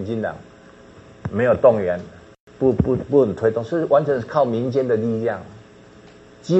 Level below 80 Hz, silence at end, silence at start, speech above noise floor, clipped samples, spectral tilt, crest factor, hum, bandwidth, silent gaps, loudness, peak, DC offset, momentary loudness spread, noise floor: -46 dBFS; 0 s; 0 s; 27 dB; under 0.1%; -8.5 dB/octave; 18 dB; none; 8.2 kHz; 2.40-2.47 s; -20 LUFS; -2 dBFS; under 0.1%; 14 LU; -46 dBFS